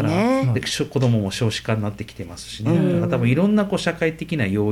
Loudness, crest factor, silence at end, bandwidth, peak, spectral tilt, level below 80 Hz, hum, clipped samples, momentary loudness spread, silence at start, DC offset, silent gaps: -21 LUFS; 14 dB; 0 s; 15 kHz; -6 dBFS; -6.5 dB/octave; -48 dBFS; none; under 0.1%; 10 LU; 0 s; under 0.1%; none